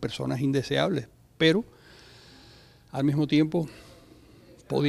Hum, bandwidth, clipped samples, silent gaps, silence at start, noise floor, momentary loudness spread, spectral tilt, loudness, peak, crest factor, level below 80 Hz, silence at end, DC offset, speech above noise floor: none; 12.5 kHz; under 0.1%; none; 0 s; -53 dBFS; 15 LU; -6.5 dB/octave; -26 LUFS; -8 dBFS; 20 dB; -58 dBFS; 0 s; under 0.1%; 28 dB